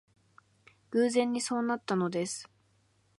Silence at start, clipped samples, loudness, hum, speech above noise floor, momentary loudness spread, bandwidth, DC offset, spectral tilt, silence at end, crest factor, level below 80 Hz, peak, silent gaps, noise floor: 0.9 s; under 0.1%; -31 LUFS; none; 40 dB; 8 LU; 11.5 kHz; under 0.1%; -4.5 dB/octave; 0.75 s; 18 dB; -80 dBFS; -16 dBFS; none; -69 dBFS